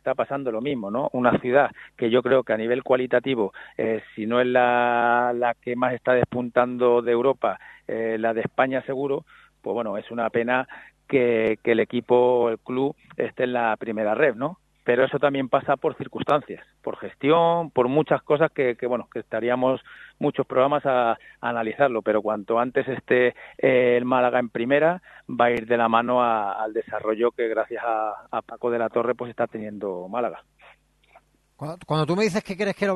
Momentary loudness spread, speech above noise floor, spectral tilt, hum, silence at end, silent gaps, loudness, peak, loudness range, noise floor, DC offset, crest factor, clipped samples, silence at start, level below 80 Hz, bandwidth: 9 LU; 35 dB; -7 dB/octave; none; 0 s; none; -23 LUFS; -2 dBFS; 5 LU; -58 dBFS; under 0.1%; 20 dB; under 0.1%; 0.05 s; -64 dBFS; 11.5 kHz